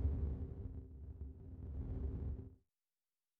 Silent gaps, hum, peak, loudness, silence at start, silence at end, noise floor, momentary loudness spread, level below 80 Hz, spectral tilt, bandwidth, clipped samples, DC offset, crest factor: none; none; -28 dBFS; -47 LUFS; 0 s; 0.85 s; under -90 dBFS; 10 LU; -48 dBFS; -12 dB/octave; 2.2 kHz; under 0.1%; under 0.1%; 16 dB